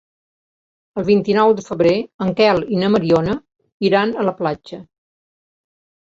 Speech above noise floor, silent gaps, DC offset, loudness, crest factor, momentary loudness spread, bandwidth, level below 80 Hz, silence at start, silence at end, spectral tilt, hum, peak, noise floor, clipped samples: over 74 dB; 2.14-2.19 s, 3.72-3.80 s; under 0.1%; -17 LUFS; 16 dB; 12 LU; 7.6 kHz; -52 dBFS; 0.95 s; 1.3 s; -7 dB/octave; none; -2 dBFS; under -90 dBFS; under 0.1%